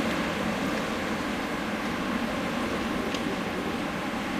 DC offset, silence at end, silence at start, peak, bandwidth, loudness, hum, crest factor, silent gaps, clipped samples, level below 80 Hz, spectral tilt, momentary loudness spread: under 0.1%; 0 s; 0 s; -14 dBFS; 15 kHz; -29 LUFS; none; 16 dB; none; under 0.1%; -50 dBFS; -4.5 dB/octave; 2 LU